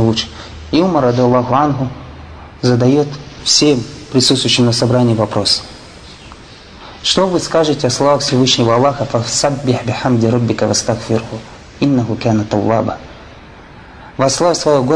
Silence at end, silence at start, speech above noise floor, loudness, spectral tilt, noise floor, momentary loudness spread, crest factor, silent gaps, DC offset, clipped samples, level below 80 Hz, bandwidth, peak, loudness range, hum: 0 s; 0 s; 23 dB; -14 LUFS; -4.5 dB/octave; -36 dBFS; 18 LU; 14 dB; none; under 0.1%; under 0.1%; -42 dBFS; 10.5 kHz; 0 dBFS; 4 LU; none